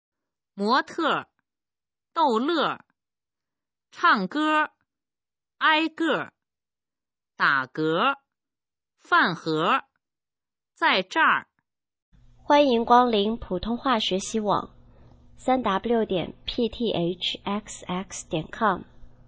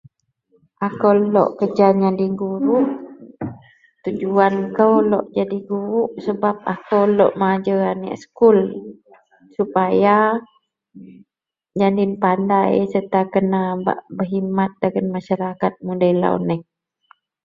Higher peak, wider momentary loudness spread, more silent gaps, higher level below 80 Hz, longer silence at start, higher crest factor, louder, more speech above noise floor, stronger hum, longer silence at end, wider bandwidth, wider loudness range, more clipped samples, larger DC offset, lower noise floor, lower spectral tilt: about the same, -4 dBFS vs -2 dBFS; about the same, 11 LU vs 12 LU; first, 12.02-12.12 s vs none; first, -54 dBFS vs -60 dBFS; second, 0.55 s vs 0.8 s; about the same, 22 dB vs 18 dB; second, -24 LUFS vs -18 LUFS; first, over 66 dB vs 45 dB; neither; second, 0.2 s vs 0.85 s; first, 8 kHz vs 7.2 kHz; about the same, 4 LU vs 3 LU; neither; neither; first, under -90 dBFS vs -62 dBFS; second, -4.5 dB/octave vs -9 dB/octave